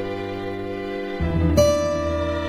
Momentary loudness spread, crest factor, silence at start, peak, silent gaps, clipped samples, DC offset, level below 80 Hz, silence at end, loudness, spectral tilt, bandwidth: 11 LU; 18 dB; 0 s; -4 dBFS; none; under 0.1%; under 0.1%; -34 dBFS; 0 s; -23 LUFS; -6 dB/octave; 15 kHz